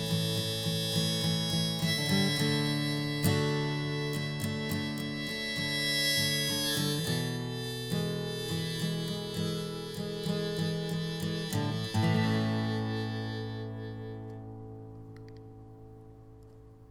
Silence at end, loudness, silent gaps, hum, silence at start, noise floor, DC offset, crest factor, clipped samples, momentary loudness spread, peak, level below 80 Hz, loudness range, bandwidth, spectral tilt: 0 s; -31 LUFS; none; none; 0 s; -52 dBFS; under 0.1%; 16 dB; under 0.1%; 16 LU; -16 dBFS; -58 dBFS; 8 LU; 19 kHz; -4.5 dB/octave